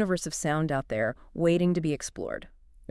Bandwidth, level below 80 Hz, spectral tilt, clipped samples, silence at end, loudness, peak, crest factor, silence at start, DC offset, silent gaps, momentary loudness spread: 12 kHz; -52 dBFS; -5.5 dB/octave; under 0.1%; 0.4 s; -28 LUFS; -14 dBFS; 16 dB; 0 s; under 0.1%; none; 11 LU